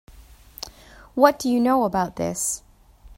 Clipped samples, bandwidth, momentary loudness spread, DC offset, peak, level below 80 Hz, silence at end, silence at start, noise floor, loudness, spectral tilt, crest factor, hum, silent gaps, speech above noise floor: under 0.1%; 16.5 kHz; 19 LU; under 0.1%; 0 dBFS; -50 dBFS; 0.05 s; 0.2 s; -49 dBFS; -22 LUFS; -4 dB/octave; 24 dB; none; none; 28 dB